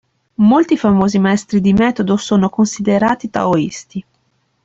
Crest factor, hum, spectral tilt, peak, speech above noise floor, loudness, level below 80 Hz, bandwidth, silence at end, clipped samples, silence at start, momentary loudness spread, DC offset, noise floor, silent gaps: 12 dB; none; -6.5 dB/octave; -2 dBFS; 49 dB; -14 LUFS; -46 dBFS; 8 kHz; 0.65 s; under 0.1%; 0.4 s; 11 LU; under 0.1%; -62 dBFS; none